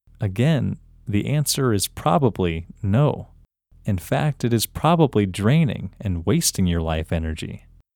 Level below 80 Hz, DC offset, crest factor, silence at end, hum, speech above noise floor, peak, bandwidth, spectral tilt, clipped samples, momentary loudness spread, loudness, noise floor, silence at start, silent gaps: -40 dBFS; under 0.1%; 18 dB; 0.4 s; none; 32 dB; -4 dBFS; 19 kHz; -5.5 dB/octave; under 0.1%; 10 LU; -22 LUFS; -53 dBFS; 0.2 s; none